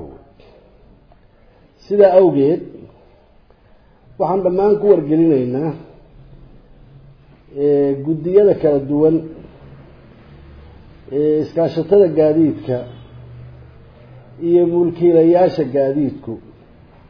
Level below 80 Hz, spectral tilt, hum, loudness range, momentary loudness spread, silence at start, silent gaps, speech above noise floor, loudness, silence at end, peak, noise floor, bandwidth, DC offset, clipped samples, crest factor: -48 dBFS; -10.5 dB/octave; none; 3 LU; 14 LU; 0 s; none; 35 dB; -15 LUFS; 0.7 s; 0 dBFS; -49 dBFS; 5.4 kHz; under 0.1%; under 0.1%; 18 dB